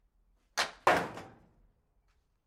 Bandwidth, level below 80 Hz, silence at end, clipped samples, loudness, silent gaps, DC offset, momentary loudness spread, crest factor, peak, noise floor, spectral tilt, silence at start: 16 kHz; -66 dBFS; 1.15 s; under 0.1%; -31 LUFS; none; under 0.1%; 14 LU; 24 dB; -12 dBFS; -73 dBFS; -2.5 dB/octave; 0.55 s